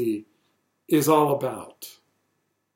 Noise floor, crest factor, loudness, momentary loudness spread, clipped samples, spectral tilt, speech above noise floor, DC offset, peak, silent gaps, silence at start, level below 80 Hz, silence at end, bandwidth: -74 dBFS; 18 dB; -23 LUFS; 22 LU; under 0.1%; -5.5 dB/octave; 51 dB; under 0.1%; -8 dBFS; none; 0 s; -72 dBFS; 0.85 s; 16.5 kHz